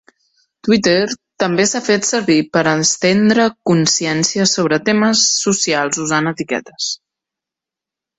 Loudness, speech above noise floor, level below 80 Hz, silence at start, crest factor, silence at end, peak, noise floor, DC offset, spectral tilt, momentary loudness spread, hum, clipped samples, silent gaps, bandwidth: -15 LUFS; 71 dB; -56 dBFS; 0.65 s; 16 dB; 1.25 s; 0 dBFS; -86 dBFS; under 0.1%; -3.5 dB/octave; 9 LU; none; under 0.1%; none; 8.4 kHz